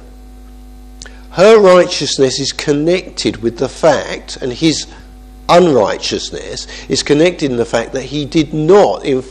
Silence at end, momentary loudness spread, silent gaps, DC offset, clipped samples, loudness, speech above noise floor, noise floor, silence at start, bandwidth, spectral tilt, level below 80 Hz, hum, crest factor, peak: 0 s; 14 LU; none; under 0.1%; 0.3%; -12 LUFS; 22 dB; -35 dBFS; 0 s; 11.5 kHz; -4.5 dB/octave; -36 dBFS; none; 14 dB; 0 dBFS